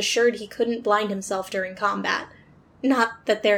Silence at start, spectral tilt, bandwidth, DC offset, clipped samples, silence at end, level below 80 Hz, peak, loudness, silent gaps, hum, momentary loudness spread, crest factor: 0 s; -3 dB/octave; 18.5 kHz; under 0.1%; under 0.1%; 0 s; -64 dBFS; -6 dBFS; -24 LUFS; none; none; 7 LU; 18 dB